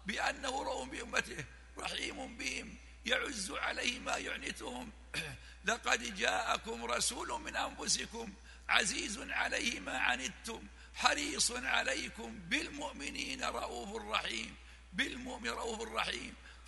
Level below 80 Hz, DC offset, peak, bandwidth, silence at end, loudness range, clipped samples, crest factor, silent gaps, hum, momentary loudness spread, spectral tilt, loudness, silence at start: -56 dBFS; under 0.1%; -8 dBFS; 11.5 kHz; 0 s; 4 LU; under 0.1%; 30 dB; none; none; 13 LU; -1.5 dB/octave; -36 LUFS; 0 s